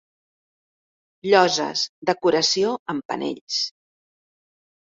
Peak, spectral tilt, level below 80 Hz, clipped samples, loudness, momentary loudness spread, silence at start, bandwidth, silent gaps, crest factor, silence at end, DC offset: -2 dBFS; -3 dB/octave; -68 dBFS; under 0.1%; -21 LUFS; 11 LU; 1.25 s; 7.8 kHz; 1.89-2.02 s, 2.79-2.86 s, 3.05-3.09 s, 3.41-3.47 s; 22 dB; 1.25 s; under 0.1%